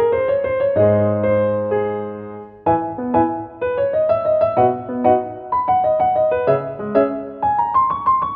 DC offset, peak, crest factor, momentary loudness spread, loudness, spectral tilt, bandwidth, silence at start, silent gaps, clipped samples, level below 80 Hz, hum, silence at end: under 0.1%; -2 dBFS; 16 dB; 7 LU; -18 LUFS; -11.5 dB/octave; 4.6 kHz; 0 s; none; under 0.1%; -50 dBFS; none; 0 s